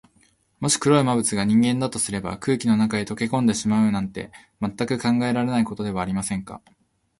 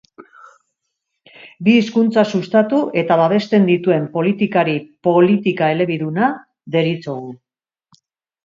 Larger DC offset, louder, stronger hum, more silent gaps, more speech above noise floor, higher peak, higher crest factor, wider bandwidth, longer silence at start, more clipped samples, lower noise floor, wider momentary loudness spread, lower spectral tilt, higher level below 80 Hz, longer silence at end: neither; second, -22 LUFS vs -16 LUFS; neither; neither; second, 39 dB vs 60 dB; second, -4 dBFS vs 0 dBFS; about the same, 18 dB vs 16 dB; first, 11.5 kHz vs 7.4 kHz; first, 0.6 s vs 0.2 s; neither; second, -61 dBFS vs -76 dBFS; first, 12 LU vs 7 LU; second, -5 dB/octave vs -7.5 dB/octave; first, -52 dBFS vs -64 dBFS; second, 0.6 s vs 1.1 s